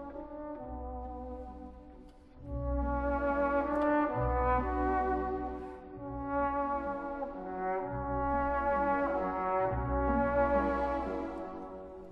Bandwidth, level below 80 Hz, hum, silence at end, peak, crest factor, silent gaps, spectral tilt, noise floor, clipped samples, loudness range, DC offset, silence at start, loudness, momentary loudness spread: 5.6 kHz; -42 dBFS; none; 0 s; -18 dBFS; 16 dB; none; -9.5 dB/octave; -53 dBFS; under 0.1%; 5 LU; under 0.1%; 0 s; -33 LUFS; 14 LU